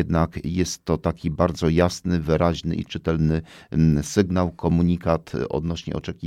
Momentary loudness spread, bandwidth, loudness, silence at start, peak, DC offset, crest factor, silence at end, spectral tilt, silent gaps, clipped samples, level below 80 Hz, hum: 7 LU; 13 kHz; -23 LUFS; 0 s; -4 dBFS; under 0.1%; 18 dB; 0 s; -6.5 dB/octave; none; under 0.1%; -38 dBFS; none